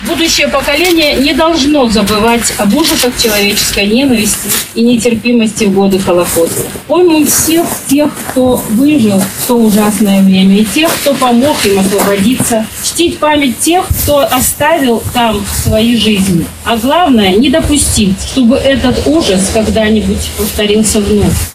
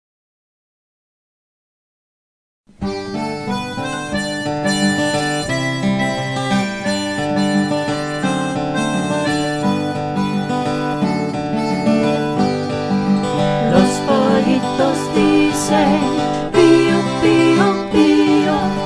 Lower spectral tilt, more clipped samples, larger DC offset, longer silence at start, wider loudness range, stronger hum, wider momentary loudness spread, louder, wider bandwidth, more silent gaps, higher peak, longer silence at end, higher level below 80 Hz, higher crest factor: second, -4 dB/octave vs -5.5 dB/octave; neither; neither; second, 0 s vs 2.8 s; second, 1 LU vs 10 LU; neither; second, 4 LU vs 8 LU; first, -9 LUFS vs -17 LUFS; first, 16 kHz vs 11 kHz; neither; about the same, 0 dBFS vs 0 dBFS; about the same, 0 s vs 0 s; first, -28 dBFS vs -44 dBFS; second, 8 dB vs 16 dB